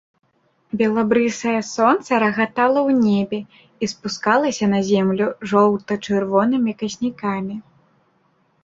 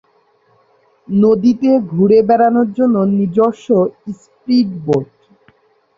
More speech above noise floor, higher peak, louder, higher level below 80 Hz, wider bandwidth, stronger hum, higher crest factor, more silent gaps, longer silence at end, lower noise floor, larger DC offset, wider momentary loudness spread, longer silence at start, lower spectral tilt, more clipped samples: about the same, 43 dB vs 43 dB; about the same, -2 dBFS vs -2 dBFS; second, -19 LUFS vs -14 LUFS; about the same, -60 dBFS vs -56 dBFS; about the same, 7.8 kHz vs 7.4 kHz; neither; about the same, 18 dB vs 14 dB; neither; about the same, 1.05 s vs 0.95 s; first, -62 dBFS vs -56 dBFS; neither; about the same, 10 LU vs 9 LU; second, 0.75 s vs 1.1 s; second, -5.5 dB/octave vs -9 dB/octave; neither